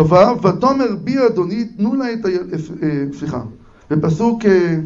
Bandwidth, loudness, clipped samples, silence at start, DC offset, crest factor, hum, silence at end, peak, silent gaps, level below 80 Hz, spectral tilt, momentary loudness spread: 7.6 kHz; -17 LUFS; under 0.1%; 0 s; under 0.1%; 14 dB; none; 0 s; 0 dBFS; none; -46 dBFS; -8 dB/octave; 11 LU